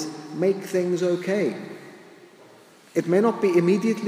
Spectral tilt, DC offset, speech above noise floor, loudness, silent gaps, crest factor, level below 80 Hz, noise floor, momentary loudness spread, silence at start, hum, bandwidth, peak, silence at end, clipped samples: -6.5 dB/octave; under 0.1%; 29 dB; -23 LUFS; none; 16 dB; -82 dBFS; -51 dBFS; 13 LU; 0 s; none; 15 kHz; -8 dBFS; 0 s; under 0.1%